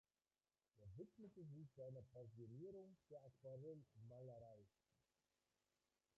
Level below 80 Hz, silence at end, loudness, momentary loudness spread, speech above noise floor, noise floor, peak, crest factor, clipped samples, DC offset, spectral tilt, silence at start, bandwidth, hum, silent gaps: -84 dBFS; 1.5 s; -61 LUFS; 6 LU; over 30 dB; under -90 dBFS; -48 dBFS; 14 dB; under 0.1%; under 0.1%; -10.5 dB/octave; 0.75 s; 6.6 kHz; none; none